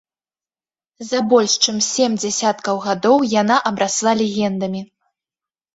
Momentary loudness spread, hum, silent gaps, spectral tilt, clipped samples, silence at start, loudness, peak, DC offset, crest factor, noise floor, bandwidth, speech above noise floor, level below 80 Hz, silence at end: 9 LU; none; none; -3 dB/octave; under 0.1%; 1 s; -17 LUFS; -2 dBFS; under 0.1%; 18 dB; under -90 dBFS; 8 kHz; over 73 dB; -62 dBFS; 0.9 s